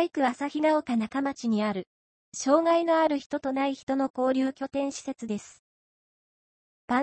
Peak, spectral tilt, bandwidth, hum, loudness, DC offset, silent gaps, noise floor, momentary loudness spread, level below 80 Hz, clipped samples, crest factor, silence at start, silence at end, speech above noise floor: -10 dBFS; -4.5 dB/octave; 8.8 kHz; none; -27 LUFS; under 0.1%; 1.87-2.32 s, 3.26-3.30 s, 3.83-3.87 s, 4.10-4.14 s, 5.59-6.88 s; under -90 dBFS; 11 LU; -70 dBFS; under 0.1%; 18 dB; 0 s; 0 s; over 63 dB